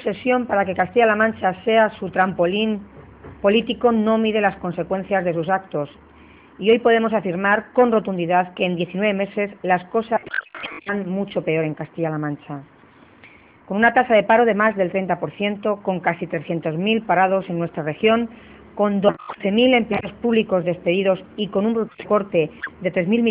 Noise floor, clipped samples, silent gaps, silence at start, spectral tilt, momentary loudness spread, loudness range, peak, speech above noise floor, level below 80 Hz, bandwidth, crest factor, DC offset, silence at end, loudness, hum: -49 dBFS; under 0.1%; none; 0 s; -10.5 dB/octave; 10 LU; 4 LU; -2 dBFS; 29 dB; -56 dBFS; 4.8 kHz; 18 dB; under 0.1%; 0 s; -20 LUFS; none